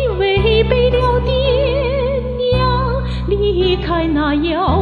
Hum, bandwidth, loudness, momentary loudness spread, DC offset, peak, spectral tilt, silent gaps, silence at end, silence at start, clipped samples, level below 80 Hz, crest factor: none; 4.9 kHz; -16 LUFS; 5 LU; under 0.1%; -2 dBFS; -8.5 dB/octave; none; 0 s; 0 s; under 0.1%; -22 dBFS; 14 dB